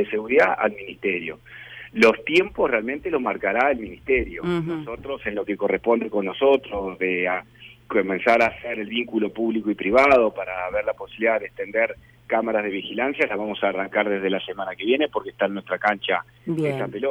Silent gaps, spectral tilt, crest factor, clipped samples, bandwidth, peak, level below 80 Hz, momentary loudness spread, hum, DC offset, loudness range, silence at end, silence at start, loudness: none; -6 dB/octave; 16 dB; under 0.1%; 13.5 kHz; -6 dBFS; -50 dBFS; 10 LU; none; under 0.1%; 3 LU; 0 s; 0 s; -23 LUFS